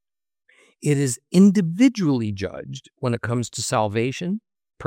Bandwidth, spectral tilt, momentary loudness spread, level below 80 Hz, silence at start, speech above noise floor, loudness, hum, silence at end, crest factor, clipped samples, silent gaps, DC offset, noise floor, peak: 16 kHz; -6 dB/octave; 14 LU; -64 dBFS; 0.8 s; 47 dB; -21 LUFS; none; 0 s; 18 dB; under 0.1%; none; under 0.1%; -67 dBFS; -4 dBFS